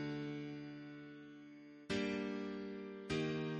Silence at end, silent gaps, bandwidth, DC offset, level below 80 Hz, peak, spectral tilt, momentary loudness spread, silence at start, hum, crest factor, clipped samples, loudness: 0 s; none; 8.8 kHz; under 0.1%; -70 dBFS; -26 dBFS; -6 dB/octave; 16 LU; 0 s; none; 18 dB; under 0.1%; -44 LUFS